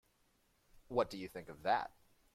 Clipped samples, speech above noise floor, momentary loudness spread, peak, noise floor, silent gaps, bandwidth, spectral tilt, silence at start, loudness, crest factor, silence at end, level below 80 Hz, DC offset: under 0.1%; 37 dB; 12 LU; -20 dBFS; -75 dBFS; none; 16 kHz; -5 dB/octave; 0.75 s; -39 LUFS; 22 dB; 0.45 s; -68 dBFS; under 0.1%